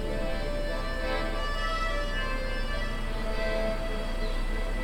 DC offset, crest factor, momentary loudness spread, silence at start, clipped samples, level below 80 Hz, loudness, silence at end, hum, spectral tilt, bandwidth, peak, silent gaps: under 0.1%; 12 dB; 4 LU; 0 s; under 0.1%; -30 dBFS; -32 LUFS; 0 s; none; -5 dB/octave; 11.5 kHz; -16 dBFS; none